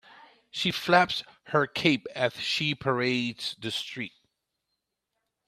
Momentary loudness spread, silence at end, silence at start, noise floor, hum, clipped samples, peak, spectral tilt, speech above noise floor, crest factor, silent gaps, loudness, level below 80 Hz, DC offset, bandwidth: 11 LU; 1.4 s; 0.55 s; -83 dBFS; none; under 0.1%; -4 dBFS; -4.5 dB/octave; 55 dB; 24 dB; none; -27 LUFS; -66 dBFS; under 0.1%; 14.5 kHz